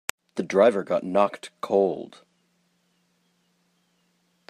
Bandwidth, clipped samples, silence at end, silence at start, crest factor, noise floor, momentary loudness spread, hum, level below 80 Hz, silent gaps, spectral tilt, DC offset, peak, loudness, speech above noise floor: 15.5 kHz; under 0.1%; 2.45 s; 0.35 s; 26 dB; -69 dBFS; 16 LU; none; -72 dBFS; none; -5 dB/octave; under 0.1%; -2 dBFS; -24 LUFS; 46 dB